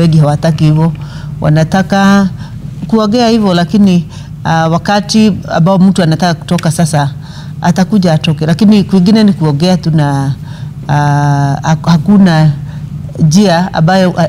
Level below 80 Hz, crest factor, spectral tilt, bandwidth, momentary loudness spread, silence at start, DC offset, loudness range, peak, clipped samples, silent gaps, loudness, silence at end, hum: -36 dBFS; 8 dB; -6.5 dB/octave; 14 kHz; 13 LU; 0 s; under 0.1%; 1 LU; 0 dBFS; under 0.1%; none; -9 LUFS; 0 s; none